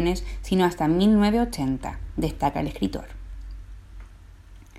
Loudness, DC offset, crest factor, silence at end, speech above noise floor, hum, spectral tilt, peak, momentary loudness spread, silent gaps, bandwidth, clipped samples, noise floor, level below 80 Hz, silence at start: -24 LUFS; under 0.1%; 16 dB; 0 s; 23 dB; none; -6.5 dB/octave; -8 dBFS; 23 LU; none; 15 kHz; under 0.1%; -46 dBFS; -36 dBFS; 0 s